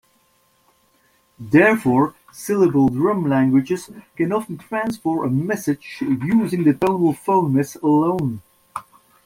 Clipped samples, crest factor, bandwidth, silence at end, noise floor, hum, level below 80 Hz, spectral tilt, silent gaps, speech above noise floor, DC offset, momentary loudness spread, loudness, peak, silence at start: under 0.1%; 18 dB; 16 kHz; 0.45 s; -61 dBFS; none; -56 dBFS; -7.5 dB/octave; none; 42 dB; under 0.1%; 14 LU; -19 LUFS; -2 dBFS; 1.4 s